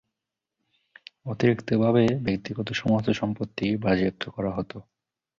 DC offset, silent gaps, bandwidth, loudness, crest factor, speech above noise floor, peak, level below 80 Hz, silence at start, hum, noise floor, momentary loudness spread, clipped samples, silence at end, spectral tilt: under 0.1%; none; 7.4 kHz; -25 LUFS; 20 dB; 61 dB; -8 dBFS; -54 dBFS; 1.25 s; none; -86 dBFS; 12 LU; under 0.1%; 0.6 s; -7.5 dB/octave